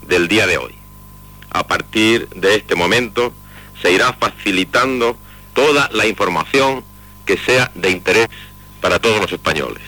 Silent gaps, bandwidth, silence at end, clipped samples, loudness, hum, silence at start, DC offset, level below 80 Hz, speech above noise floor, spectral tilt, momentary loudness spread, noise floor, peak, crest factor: none; 19 kHz; 0 s; under 0.1%; -15 LUFS; 50 Hz at -40 dBFS; 0 s; under 0.1%; -42 dBFS; 23 dB; -3.5 dB/octave; 9 LU; -39 dBFS; -4 dBFS; 14 dB